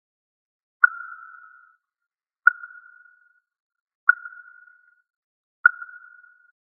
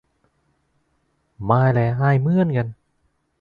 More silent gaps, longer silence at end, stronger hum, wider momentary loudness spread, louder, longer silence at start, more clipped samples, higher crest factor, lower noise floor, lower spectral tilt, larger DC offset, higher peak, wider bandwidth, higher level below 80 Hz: first, 3.60-3.70 s, 3.80-3.86 s, 3.95-4.07 s, 5.16-5.64 s vs none; first, 1 s vs 0.65 s; neither; first, 22 LU vs 11 LU; about the same, -21 LUFS vs -19 LUFS; second, 0.85 s vs 1.4 s; neither; first, 28 dB vs 20 dB; first, -88 dBFS vs -68 dBFS; second, 7.5 dB/octave vs -10.5 dB/octave; neither; about the same, 0 dBFS vs -2 dBFS; second, 2.2 kHz vs 4.9 kHz; second, under -90 dBFS vs -52 dBFS